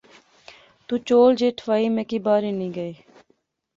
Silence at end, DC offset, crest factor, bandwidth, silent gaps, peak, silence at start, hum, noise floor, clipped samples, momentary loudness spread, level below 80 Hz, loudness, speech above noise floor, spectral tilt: 0.85 s; under 0.1%; 18 dB; 7.6 kHz; none; -6 dBFS; 0.9 s; none; -67 dBFS; under 0.1%; 13 LU; -66 dBFS; -21 LUFS; 46 dB; -6.5 dB/octave